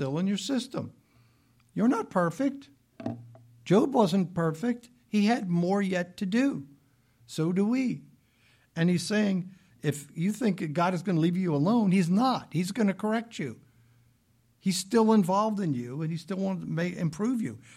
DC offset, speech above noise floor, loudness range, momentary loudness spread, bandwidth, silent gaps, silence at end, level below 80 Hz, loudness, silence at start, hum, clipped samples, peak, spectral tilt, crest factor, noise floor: under 0.1%; 40 dB; 3 LU; 14 LU; 14.5 kHz; none; 0.2 s; -70 dBFS; -28 LUFS; 0 s; none; under 0.1%; -10 dBFS; -6.5 dB/octave; 18 dB; -67 dBFS